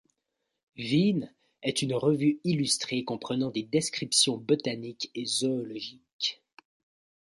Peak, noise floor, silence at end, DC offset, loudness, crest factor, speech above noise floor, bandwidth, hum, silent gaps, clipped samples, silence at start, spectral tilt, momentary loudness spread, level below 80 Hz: -10 dBFS; -83 dBFS; 0.95 s; under 0.1%; -28 LUFS; 20 dB; 54 dB; 11.5 kHz; none; 6.13-6.19 s; under 0.1%; 0.75 s; -4 dB/octave; 11 LU; -72 dBFS